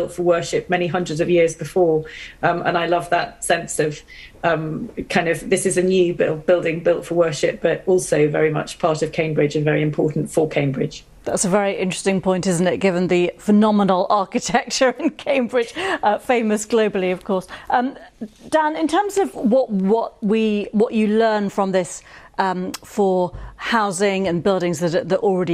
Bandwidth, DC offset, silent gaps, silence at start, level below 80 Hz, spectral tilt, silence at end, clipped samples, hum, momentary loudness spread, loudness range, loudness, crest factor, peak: 14.5 kHz; under 0.1%; none; 0 s; -50 dBFS; -5 dB/octave; 0 s; under 0.1%; none; 6 LU; 3 LU; -19 LUFS; 18 dB; -2 dBFS